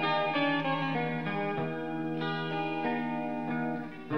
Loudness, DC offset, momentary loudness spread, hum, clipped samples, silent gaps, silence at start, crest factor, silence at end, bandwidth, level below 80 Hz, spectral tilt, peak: -32 LUFS; 0.3%; 6 LU; none; under 0.1%; none; 0 s; 14 dB; 0 s; 6.4 kHz; -74 dBFS; -7.5 dB/octave; -18 dBFS